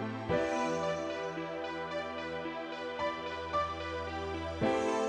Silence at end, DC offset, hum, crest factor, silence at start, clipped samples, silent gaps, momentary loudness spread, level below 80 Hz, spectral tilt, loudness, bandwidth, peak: 0 s; under 0.1%; none; 16 dB; 0 s; under 0.1%; none; 7 LU; -56 dBFS; -5 dB/octave; -36 LUFS; 10.5 kHz; -18 dBFS